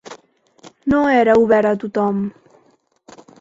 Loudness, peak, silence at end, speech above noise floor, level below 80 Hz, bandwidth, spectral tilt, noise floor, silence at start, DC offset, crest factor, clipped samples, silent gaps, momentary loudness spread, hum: -16 LUFS; -2 dBFS; 1.1 s; 43 dB; -52 dBFS; 7.8 kHz; -7 dB/octave; -58 dBFS; 0.1 s; under 0.1%; 18 dB; under 0.1%; none; 12 LU; none